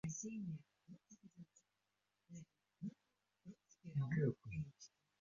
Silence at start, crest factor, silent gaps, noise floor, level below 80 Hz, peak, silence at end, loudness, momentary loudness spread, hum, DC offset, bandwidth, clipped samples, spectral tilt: 0.05 s; 22 dB; none; -88 dBFS; -74 dBFS; -28 dBFS; 0.35 s; -46 LUFS; 24 LU; none; under 0.1%; 7.4 kHz; under 0.1%; -9 dB/octave